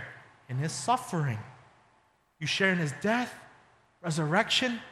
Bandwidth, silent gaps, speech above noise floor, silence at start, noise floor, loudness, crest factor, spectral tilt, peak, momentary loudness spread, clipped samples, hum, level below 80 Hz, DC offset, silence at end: 14 kHz; none; 38 dB; 0 s; -67 dBFS; -29 LUFS; 20 dB; -4.5 dB/octave; -10 dBFS; 14 LU; under 0.1%; none; -70 dBFS; under 0.1%; 0 s